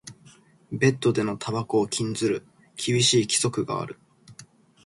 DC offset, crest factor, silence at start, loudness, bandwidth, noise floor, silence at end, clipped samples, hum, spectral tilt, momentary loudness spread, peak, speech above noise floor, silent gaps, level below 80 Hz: under 0.1%; 20 dB; 0.05 s; -24 LUFS; 11.5 kHz; -54 dBFS; 0.4 s; under 0.1%; none; -4 dB/octave; 15 LU; -6 dBFS; 30 dB; none; -62 dBFS